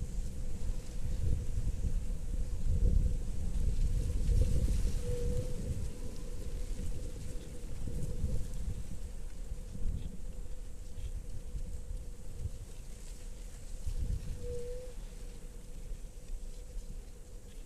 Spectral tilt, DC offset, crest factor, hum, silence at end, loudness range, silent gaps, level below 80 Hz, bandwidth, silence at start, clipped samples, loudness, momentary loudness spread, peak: -6.5 dB/octave; under 0.1%; 16 dB; none; 0 s; 11 LU; none; -36 dBFS; 13 kHz; 0 s; under 0.1%; -40 LUFS; 15 LU; -18 dBFS